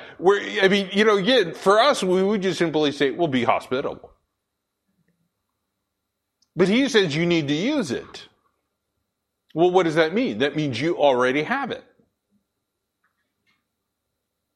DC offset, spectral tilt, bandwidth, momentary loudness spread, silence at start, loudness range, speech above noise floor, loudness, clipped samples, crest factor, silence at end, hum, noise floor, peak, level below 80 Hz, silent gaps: under 0.1%; -5 dB/octave; 12.5 kHz; 11 LU; 0 s; 9 LU; 59 dB; -21 LUFS; under 0.1%; 20 dB; 2.75 s; none; -79 dBFS; -2 dBFS; -64 dBFS; none